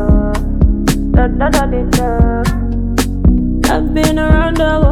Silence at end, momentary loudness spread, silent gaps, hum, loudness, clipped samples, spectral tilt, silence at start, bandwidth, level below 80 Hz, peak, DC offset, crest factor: 0 s; 4 LU; none; none; -14 LUFS; under 0.1%; -6 dB/octave; 0 s; 16 kHz; -14 dBFS; 0 dBFS; under 0.1%; 12 dB